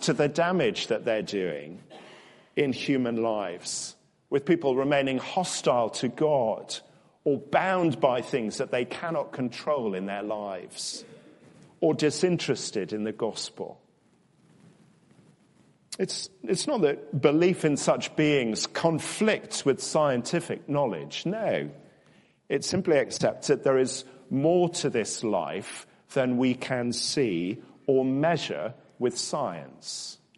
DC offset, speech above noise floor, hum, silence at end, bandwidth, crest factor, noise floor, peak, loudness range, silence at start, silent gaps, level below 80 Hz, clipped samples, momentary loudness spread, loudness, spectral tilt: under 0.1%; 37 dB; none; 0.25 s; 11.5 kHz; 20 dB; -64 dBFS; -6 dBFS; 6 LU; 0 s; none; -70 dBFS; under 0.1%; 10 LU; -27 LUFS; -4.5 dB/octave